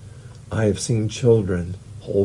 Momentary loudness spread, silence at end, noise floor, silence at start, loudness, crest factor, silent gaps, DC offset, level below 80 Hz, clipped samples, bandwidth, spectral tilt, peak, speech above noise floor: 19 LU; 0 s; -40 dBFS; 0 s; -21 LUFS; 18 dB; none; under 0.1%; -48 dBFS; under 0.1%; 11.5 kHz; -6.5 dB/octave; -4 dBFS; 20 dB